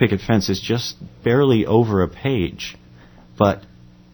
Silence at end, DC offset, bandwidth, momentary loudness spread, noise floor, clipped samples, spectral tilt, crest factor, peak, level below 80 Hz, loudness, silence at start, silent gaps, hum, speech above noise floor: 0.55 s; under 0.1%; over 20 kHz; 13 LU; -46 dBFS; under 0.1%; -6.5 dB/octave; 20 dB; 0 dBFS; -44 dBFS; -19 LUFS; 0 s; none; none; 27 dB